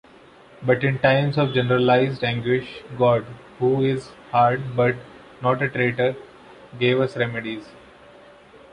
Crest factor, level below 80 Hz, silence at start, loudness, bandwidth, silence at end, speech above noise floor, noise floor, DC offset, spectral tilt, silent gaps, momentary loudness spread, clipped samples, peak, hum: 20 dB; -56 dBFS; 0.6 s; -21 LUFS; 10 kHz; 1 s; 28 dB; -49 dBFS; under 0.1%; -8 dB/octave; none; 11 LU; under 0.1%; -2 dBFS; none